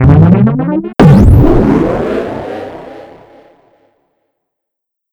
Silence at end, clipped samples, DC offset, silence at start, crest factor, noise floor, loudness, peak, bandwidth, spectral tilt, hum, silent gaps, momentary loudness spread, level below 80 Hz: 2.1 s; 4%; under 0.1%; 0 s; 10 dB; -76 dBFS; -8 LUFS; 0 dBFS; 10.5 kHz; -9.5 dB/octave; none; none; 19 LU; -20 dBFS